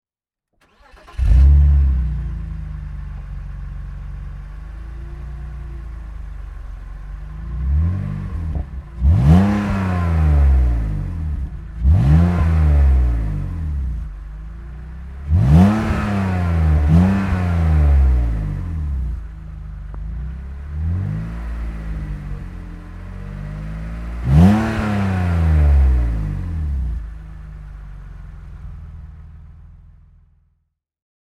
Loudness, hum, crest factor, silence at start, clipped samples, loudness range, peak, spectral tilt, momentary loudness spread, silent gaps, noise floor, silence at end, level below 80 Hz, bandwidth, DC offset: -18 LUFS; none; 18 dB; 1.1 s; under 0.1%; 16 LU; 0 dBFS; -9 dB/octave; 21 LU; none; -86 dBFS; 1.6 s; -20 dBFS; 6.2 kHz; under 0.1%